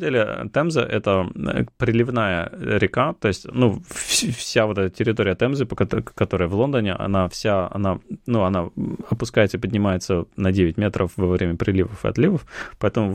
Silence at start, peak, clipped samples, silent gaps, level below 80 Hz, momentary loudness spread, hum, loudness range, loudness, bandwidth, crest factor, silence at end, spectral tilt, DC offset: 0 s; -4 dBFS; under 0.1%; none; -44 dBFS; 5 LU; none; 1 LU; -22 LUFS; 16 kHz; 18 dB; 0 s; -5.5 dB/octave; under 0.1%